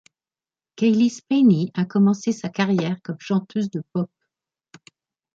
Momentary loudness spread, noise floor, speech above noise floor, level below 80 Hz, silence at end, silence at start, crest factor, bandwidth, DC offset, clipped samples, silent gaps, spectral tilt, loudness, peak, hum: 10 LU; under -90 dBFS; over 70 dB; -68 dBFS; 1.3 s; 0.8 s; 16 dB; 7.6 kHz; under 0.1%; under 0.1%; none; -7 dB/octave; -21 LUFS; -6 dBFS; none